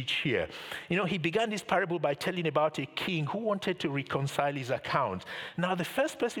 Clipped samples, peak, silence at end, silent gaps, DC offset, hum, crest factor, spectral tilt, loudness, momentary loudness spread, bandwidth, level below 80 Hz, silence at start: under 0.1%; -10 dBFS; 0 s; none; under 0.1%; none; 20 dB; -5 dB/octave; -31 LUFS; 5 LU; 19 kHz; -68 dBFS; 0 s